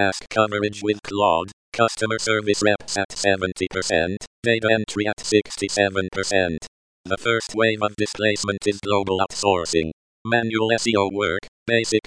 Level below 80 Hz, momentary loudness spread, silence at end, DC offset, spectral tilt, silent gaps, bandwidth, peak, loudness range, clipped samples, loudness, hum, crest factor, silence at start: -52 dBFS; 6 LU; 0.05 s; 0.1%; -4 dB/octave; 1.53-1.72 s, 3.05-3.09 s, 4.27-4.43 s, 5.13-5.17 s, 6.68-7.04 s, 9.93-10.25 s, 11.48-11.66 s; 10.5 kHz; -2 dBFS; 1 LU; under 0.1%; -22 LUFS; none; 20 dB; 0 s